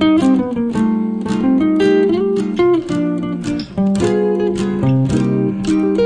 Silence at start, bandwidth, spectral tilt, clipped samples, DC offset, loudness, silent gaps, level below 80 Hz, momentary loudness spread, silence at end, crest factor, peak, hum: 0 s; 10 kHz; -7.5 dB/octave; under 0.1%; under 0.1%; -16 LUFS; none; -42 dBFS; 6 LU; 0 s; 12 dB; -2 dBFS; none